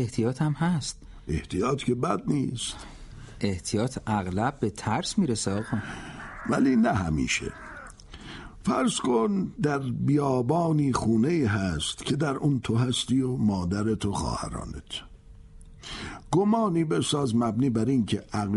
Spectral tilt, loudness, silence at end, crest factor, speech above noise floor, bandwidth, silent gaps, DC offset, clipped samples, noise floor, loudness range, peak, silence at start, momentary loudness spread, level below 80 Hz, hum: -5.5 dB/octave; -27 LUFS; 0 s; 18 dB; 22 dB; 11.5 kHz; none; under 0.1%; under 0.1%; -48 dBFS; 4 LU; -10 dBFS; 0 s; 14 LU; -46 dBFS; none